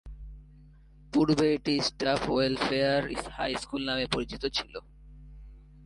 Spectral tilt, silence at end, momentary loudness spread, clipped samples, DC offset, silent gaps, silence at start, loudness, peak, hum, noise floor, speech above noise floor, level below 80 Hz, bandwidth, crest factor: -5 dB/octave; 0 s; 16 LU; under 0.1%; under 0.1%; none; 0.05 s; -28 LUFS; -10 dBFS; none; -54 dBFS; 25 dB; -48 dBFS; 11.5 kHz; 20 dB